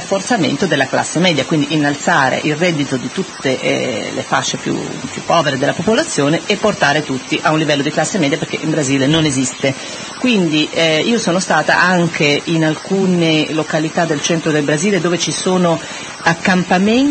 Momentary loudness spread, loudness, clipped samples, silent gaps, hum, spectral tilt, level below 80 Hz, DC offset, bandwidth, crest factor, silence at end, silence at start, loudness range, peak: 6 LU; -15 LUFS; under 0.1%; none; none; -4 dB/octave; -52 dBFS; under 0.1%; 8.8 kHz; 14 dB; 0 s; 0 s; 3 LU; 0 dBFS